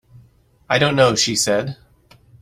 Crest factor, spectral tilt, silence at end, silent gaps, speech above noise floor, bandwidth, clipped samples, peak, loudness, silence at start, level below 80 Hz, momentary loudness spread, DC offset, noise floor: 18 dB; -3.5 dB/octave; 0.65 s; none; 36 dB; 16 kHz; under 0.1%; -2 dBFS; -17 LUFS; 0.7 s; -52 dBFS; 14 LU; under 0.1%; -53 dBFS